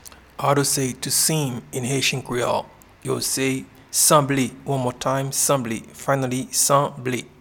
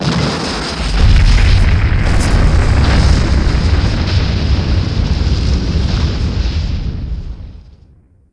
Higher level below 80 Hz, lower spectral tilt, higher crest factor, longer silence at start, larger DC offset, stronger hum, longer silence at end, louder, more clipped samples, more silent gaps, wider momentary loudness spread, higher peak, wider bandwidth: second, -54 dBFS vs -14 dBFS; second, -3.5 dB/octave vs -6 dB/octave; first, 20 dB vs 12 dB; about the same, 0.05 s vs 0 s; neither; neither; second, 0.15 s vs 0.6 s; second, -21 LUFS vs -14 LUFS; neither; neither; about the same, 11 LU vs 10 LU; about the same, -2 dBFS vs 0 dBFS; first, 19 kHz vs 10.5 kHz